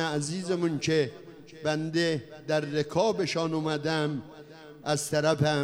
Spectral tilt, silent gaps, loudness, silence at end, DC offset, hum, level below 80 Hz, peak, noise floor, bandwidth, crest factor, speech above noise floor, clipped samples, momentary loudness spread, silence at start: -5 dB/octave; none; -29 LUFS; 0 s; under 0.1%; none; -66 dBFS; -12 dBFS; -48 dBFS; 15 kHz; 18 dB; 20 dB; under 0.1%; 12 LU; 0 s